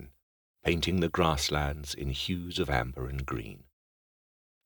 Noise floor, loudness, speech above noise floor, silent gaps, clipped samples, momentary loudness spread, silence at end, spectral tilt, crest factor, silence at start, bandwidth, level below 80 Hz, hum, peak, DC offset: under -90 dBFS; -31 LUFS; over 59 dB; 0.23-0.54 s; under 0.1%; 10 LU; 1.1 s; -4.5 dB/octave; 22 dB; 0 s; over 20 kHz; -42 dBFS; none; -10 dBFS; under 0.1%